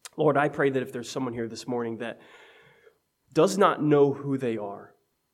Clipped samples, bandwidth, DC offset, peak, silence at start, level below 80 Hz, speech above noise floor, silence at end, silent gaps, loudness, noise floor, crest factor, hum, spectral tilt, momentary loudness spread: under 0.1%; 15 kHz; under 0.1%; -6 dBFS; 0.15 s; -72 dBFS; 37 dB; 0.45 s; none; -26 LUFS; -62 dBFS; 20 dB; none; -6 dB/octave; 15 LU